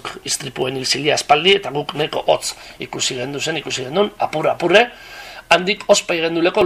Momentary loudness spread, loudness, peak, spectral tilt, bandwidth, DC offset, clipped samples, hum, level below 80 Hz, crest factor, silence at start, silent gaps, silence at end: 10 LU; -17 LUFS; 0 dBFS; -3 dB/octave; 15.5 kHz; under 0.1%; under 0.1%; none; -52 dBFS; 18 dB; 0.05 s; none; 0 s